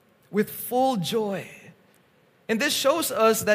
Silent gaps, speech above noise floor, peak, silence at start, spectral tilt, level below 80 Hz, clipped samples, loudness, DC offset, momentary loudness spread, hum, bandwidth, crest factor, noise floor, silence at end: none; 37 dB; -8 dBFS; 0.3 s; -3.5 dB/octave; -68 dBFS; under 0.1%; -24 LUFS; under 0.1%; 11 LU; none; 15.5 kHz; 18 dB; -61 dBFS; 0 s